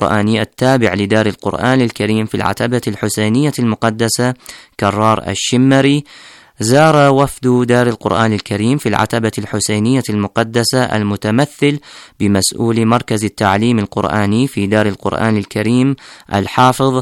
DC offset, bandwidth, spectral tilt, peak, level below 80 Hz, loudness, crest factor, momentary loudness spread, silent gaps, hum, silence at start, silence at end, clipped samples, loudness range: under 0.1%; 16.5 kHz; -5.5 dB/octave; 0 dBFS; -48 dBFS; -14 LUFS; 12 dB; 6 LU; none; none; 0 s; 0 s; under 0.1%; 3 LU